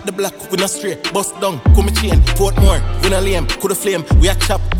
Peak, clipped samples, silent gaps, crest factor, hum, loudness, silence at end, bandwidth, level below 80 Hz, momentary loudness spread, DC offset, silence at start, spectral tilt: 0 dBFS; under 0.1%; none; 14 dB; none; -15 LUFS; 0 s; 17 kHz; -16 dBFS; 6 LU; under 0.1%; 0 s; -4.5 dB/octave